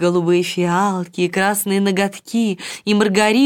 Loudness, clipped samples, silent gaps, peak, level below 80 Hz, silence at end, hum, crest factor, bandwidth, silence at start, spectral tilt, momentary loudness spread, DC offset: -18 LUFS; under 0.1%; none; -2 dBFS; -64 dBFS; 0 s; none; 14 dB; 18 kHz; 0 s; -5 dB/octave; 6 LU; under 0.1%